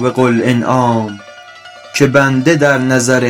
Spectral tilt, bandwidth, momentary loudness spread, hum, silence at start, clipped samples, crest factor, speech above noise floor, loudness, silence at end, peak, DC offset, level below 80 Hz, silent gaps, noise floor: -5.5 dB/octave; 16 kHz; 10 LU; none; 0 s; 0.6%; 12 dB; 24 dB; -12 LUFS; 0 s; 0 dBFS; under 0.1%; -50 dBFS; none; -35 dBFS